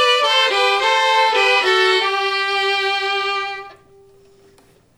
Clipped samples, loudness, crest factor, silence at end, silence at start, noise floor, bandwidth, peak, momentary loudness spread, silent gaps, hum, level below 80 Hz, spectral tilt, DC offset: under 0.1%; -15 LUFS; 14 dB; 1.25 s; 0 s; -52 dBFS; 16 kHz; -4 dBFS; 7 LU; none; none; -60 dBFS; 0 dB/octave; under 0.1%